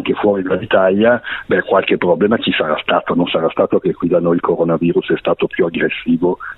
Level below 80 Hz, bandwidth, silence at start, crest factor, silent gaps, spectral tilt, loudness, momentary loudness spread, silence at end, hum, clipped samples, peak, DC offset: -50 dBFS; 4.1 kHz; 0 s; 14 dB; none; -9.5 dB/octave; -15 LUFS; 4 LU; 0.05 s; none; under 0.1%; 0 dBFS; under 0.1%